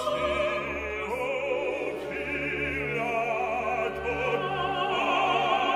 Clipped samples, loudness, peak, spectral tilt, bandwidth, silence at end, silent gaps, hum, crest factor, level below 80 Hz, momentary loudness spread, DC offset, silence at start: under 0.1%; -28 LUFS; -12 dBFS; -4.5 dB/octave; 15.5 kHz; 0 s; none; none; 16 dB; -50 dBFS; 7 LU; under 0.1%; 0 s